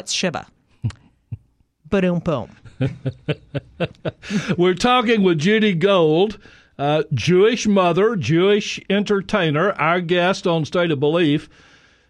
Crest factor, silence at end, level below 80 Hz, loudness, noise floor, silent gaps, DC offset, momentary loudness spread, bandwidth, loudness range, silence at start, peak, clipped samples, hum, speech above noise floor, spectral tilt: 16 dB; 0.65 s; -50 dBFS; -19 LUFS; -56 dBFS; none; under 0.1%; 14 LU; 11 kHz; 8 LU; 0.05 s; -4 dBFS; under 0.1%; none; 38 dB; -5.5 dB/octave